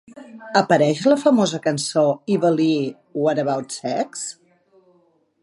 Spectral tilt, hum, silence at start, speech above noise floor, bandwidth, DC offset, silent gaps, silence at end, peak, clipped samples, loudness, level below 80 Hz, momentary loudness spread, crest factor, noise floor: -5 dB/octave; none; 0.15 s; 41 dB; 11.5 kHz; under 0.1%; none; 1.1 s; -2 dBFS; under 0.1%; -20 LUFS; -72 dBFS; 11 LU; 18 dB; -61 dBFS